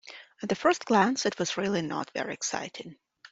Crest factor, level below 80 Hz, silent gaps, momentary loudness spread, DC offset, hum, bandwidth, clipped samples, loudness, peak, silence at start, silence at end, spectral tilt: 22 dB; -70 dBFS; none; 17 LU; under 0.1%; none; 8.2 kHz; under 0.1%; -28 LUFS; -8 dBFS; 0.05 s; 0.05 s; -3.5 dB/octave